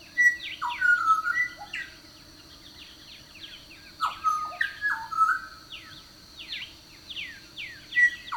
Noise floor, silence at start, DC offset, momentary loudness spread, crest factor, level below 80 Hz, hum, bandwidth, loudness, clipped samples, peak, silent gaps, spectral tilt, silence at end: -50 dBFS; 0 s; under 0.1%; 24 LU; 18 dB; -62 dBFS; none; 19 kHz; -26 LUFS; under 0.1%; -10 dBFS; none; -0.5 dB/octave; 0 s